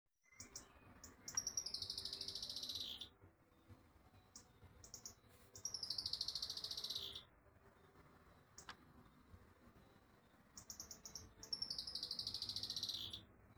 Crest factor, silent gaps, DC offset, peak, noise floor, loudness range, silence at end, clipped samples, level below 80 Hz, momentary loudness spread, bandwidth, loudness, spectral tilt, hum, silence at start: 24 dB; none; under 0.1%; -28 dBFS; -70 dBFS; 12 LU; 0.05 s; under 0.1%; -72 dBFS; 24 LU; over 20 kHz; -46 LUFS; -0.5 dB/octave; none; 0.3 s